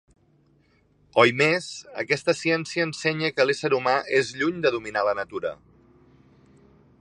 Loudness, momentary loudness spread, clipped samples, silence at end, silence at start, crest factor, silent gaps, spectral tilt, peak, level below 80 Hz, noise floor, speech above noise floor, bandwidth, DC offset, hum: -23 LUFS; 10 LU; under 0.1%; 1.45 s; 1.15 s; 24 dB; none; -4.5 dB/octave; -2 dBFS; -64 dBFS; -62 dBFS; 38 dB; 11.5 kHz; under 0.1%; none